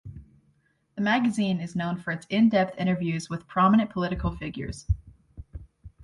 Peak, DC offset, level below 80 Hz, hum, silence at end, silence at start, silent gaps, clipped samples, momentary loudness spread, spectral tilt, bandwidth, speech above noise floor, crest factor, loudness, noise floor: -10 dBFS; under 0.1%; -42 dBFS; none; 0 s; 0.05 s; none; under 0.1%; 22 LU; -6.5 dB/octave; 11.5 kHz; 42 dB; 18 dB; -26 LUFS; -67 dBFS